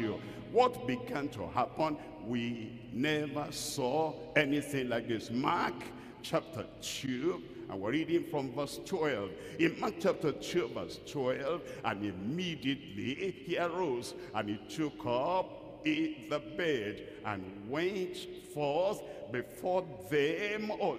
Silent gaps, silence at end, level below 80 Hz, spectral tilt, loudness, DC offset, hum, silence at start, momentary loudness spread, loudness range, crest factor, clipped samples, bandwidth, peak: none; 0 s; -66 dBFS; -5 dB/octave; -35 LUFS; under 0.1%; none; 0 s; 9 LU; 3 LU; 24 dB; under 0.1%; 15.5 kHz; -12 dBFS